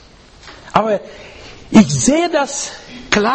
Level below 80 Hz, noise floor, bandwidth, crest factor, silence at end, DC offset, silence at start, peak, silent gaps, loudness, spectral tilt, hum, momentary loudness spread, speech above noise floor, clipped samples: -42 dBFS; -41 dBFS; 8.8 kHz; 16 dB; 0 s; under 0.1%; 0.45 s; 0 dBFS; none; -15 LUFS; -4.5 dB/octave; none; 24 LU; 26 dB; 0.2%